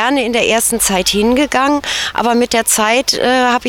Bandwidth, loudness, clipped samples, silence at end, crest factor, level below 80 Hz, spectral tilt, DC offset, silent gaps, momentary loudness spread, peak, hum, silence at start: 18 kHz; -13 LUFS; under 0.1%; 0 s; 12 dB; -40 dBFS; -2 dB/octave; under 0.1%; none; 3 LU; 0 dBFS; none; 0 s